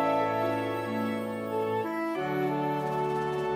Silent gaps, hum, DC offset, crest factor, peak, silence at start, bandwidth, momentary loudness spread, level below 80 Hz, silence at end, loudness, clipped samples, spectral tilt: none; none; under 0.1%; 14 dB; -16 dBFS; 0 s; 16 kHz; 4 LU; -64 dBFS; 0 s; -30 LUFS; under 0.1%; -7 dB/octave